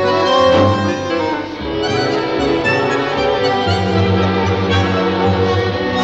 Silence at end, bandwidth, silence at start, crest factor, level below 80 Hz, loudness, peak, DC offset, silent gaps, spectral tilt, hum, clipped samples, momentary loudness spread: 0 s; 8 kHz; 0 s; 14 dB; -40 dBFS; -15 LUFS; -2 dBFS; 0.2%; none; -6 dB/octave; none; under 0.1%; 6 LU